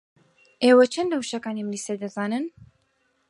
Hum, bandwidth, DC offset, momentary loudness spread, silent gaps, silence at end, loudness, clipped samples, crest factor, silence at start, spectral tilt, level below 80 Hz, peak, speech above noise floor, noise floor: none; 11.5 kHz; under 0.1%; 13 LU; none; 0.8 s; -23 LUFS; under 0.1%; 18 dB; 0.6 s; -4.5 dB/octave; -70 dBFS; -6 dBFS; 47 dB; -69 dBFS